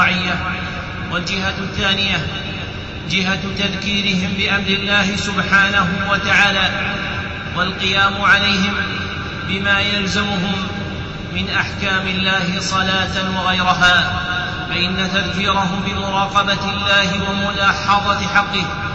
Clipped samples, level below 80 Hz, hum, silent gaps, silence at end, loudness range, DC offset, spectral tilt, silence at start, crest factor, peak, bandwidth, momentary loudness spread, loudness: under 0.1%; -36 dBFS; none; none; 0 s; 4 LU; under 0.1%; -4 dB/octave; 0 s; 16 dB; -2 dBFS; 8.2 kHz; 10 LU; -17 LUFS